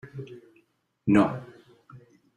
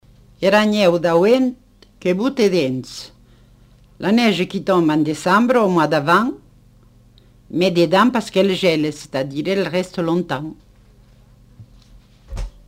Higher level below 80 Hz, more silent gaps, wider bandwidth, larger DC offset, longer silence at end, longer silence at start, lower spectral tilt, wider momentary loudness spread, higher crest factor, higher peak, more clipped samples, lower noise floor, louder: second, -64 dBFS vs -44 dBFS; neither; second, 10.5 kHz vs 16 kHz; neither; first, 0.4 s vs 0.2 s; second, 0.05 s vs 0.4 s; first, -8 dB/octave vs -6 dB/octave; first, 20 LU vs 13 LU; first, 22 dB vs 16 dB; second, -8 dBFS vs -2 dBFS; neither; first, -68 dBFS vs -49 dBFS; second, -24 LUFS vs -17 LUFS